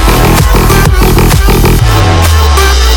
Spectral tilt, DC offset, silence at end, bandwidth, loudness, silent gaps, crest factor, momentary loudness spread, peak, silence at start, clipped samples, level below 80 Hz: -5 dB/octave; under 0.1%; 0 s; 19.5 kHz; -6 LUFS; none; 4 dB; 1 LU; 0 dBFS; 0 s; 0.5%; -8 dBFS